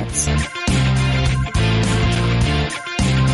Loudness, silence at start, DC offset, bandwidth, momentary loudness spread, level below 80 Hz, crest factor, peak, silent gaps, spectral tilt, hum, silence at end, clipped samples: -18 LUFS; 0 s; under 0.1%; 11.5 kHz; 3 LU; -24 dBFS; 12 dB; -4 dBFS; none; -5 dB/octave; none; 0 s; under 0.1%